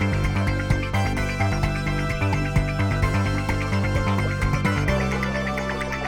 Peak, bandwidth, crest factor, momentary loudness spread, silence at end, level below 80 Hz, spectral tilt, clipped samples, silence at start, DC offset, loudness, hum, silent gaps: -8 dBFS; 14.5 kHz; 16 dB; 3 LU; 0 s; -30 dBFS; -6.5 dB/octave; under 0.1%; 0 s; under 0.1%; -23 LUFS; none; none